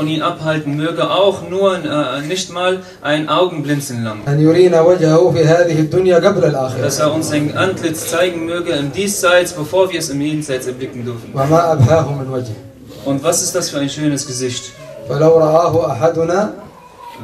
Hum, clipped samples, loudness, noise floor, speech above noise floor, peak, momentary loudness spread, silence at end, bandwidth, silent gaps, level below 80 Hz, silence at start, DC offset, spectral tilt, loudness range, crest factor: none; under 0.1%; -15 LUFS; -36 dBFS; 21 dB; 0 dBFS; 12 LU; 0 s; 15 kHz; none; -50 dBFS; 0 s; under 0.1%; -5 dB/octave; 5 LU; 14 dB